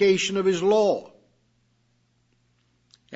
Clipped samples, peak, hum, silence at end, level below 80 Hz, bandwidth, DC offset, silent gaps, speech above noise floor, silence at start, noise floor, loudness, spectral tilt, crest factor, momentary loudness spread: under 0.1%; -10 dBFS; 60 Hz at -65 dBFS; 0 s; -70 dBFS; 8 kHz; under 0.1%; none; 46 dB; 0 s; -67 dBFS; -22 LUFS; -4.5 dB/octave; 16 dB; 5 LU